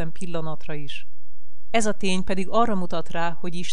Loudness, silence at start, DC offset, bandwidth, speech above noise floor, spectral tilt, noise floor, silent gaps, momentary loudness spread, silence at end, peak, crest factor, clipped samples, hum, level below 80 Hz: -27 LUFS; 0 s; 20%; 12 kHz; 21 dB; -5 dB/octave; -48 dBFS; none; 12 LU; 0 s; -6 dBFS; 18 dB; under 0.1%; none; -48 dBFS